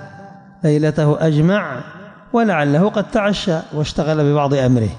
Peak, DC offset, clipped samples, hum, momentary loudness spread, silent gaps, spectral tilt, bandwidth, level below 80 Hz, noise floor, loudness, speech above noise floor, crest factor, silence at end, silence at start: -4 dBFS; under 0.1%; under 0.1%; none; 7 LU; none; -7 dB/octave; 10 kHz; -44 dBFS; -39 dBFS; -17 LUFS; 23 dB; 12 dB; 0 s; 0 s